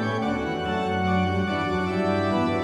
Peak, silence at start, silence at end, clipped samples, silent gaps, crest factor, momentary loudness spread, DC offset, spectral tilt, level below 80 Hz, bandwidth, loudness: -10 dBFS; 0 s; 0 s; under 0.1%; none; 14 dB; 3 LU; under 0.1%; -7 dB/octave; -50 dBFS; 10 kHz; -25 LUFS